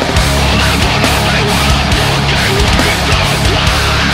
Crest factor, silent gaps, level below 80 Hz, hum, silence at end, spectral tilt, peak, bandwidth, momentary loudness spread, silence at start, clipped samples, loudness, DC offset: 10 dB; none; -18 dBFS; none; 0 s; -4 dB/octave; 0 dBFS; 16.5 kHz; 1 LU; 0 s; under 0.1%; -10 LUFS; under 0.1%